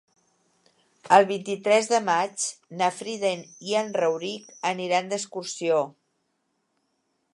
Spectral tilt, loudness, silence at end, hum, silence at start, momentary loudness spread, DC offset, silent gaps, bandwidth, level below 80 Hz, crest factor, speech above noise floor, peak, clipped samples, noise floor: -3 dB/octave; -25 LUFS; 1.45 s; none; 1.05 s; 11 LU; under 0.1%; none; 11.5 kHz; -82 dBFS; 24 dB; 50 dB; -2 dBFS; under 0.1%; -74 dBFS